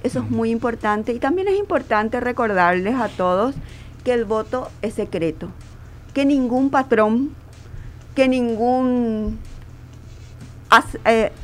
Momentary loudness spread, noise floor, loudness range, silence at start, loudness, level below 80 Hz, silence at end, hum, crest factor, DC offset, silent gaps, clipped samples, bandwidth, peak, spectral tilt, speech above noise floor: 21 LU; -39 dBFS; 3 LU; 0.05 s; -20 LUFS; -40 dBFS; 0 s; none; 20 dB; under 0.1%; none; under 0.1%; 15 kHz; 0 dBFS; -6 dB/octave; 20 dB